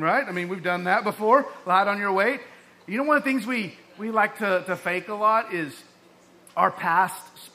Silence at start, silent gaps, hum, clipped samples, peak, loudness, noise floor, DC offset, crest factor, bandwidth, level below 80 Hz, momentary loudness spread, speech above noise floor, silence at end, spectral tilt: 0 s; none; none; under 0.1%; -4 dBFS; -24 LUFS; -54 dBFS; under 0.1%; 20 dB; 15.5 kHz; -78 dBFS; 10 LU; 30 dB; 0.05 s; -5 dB/octave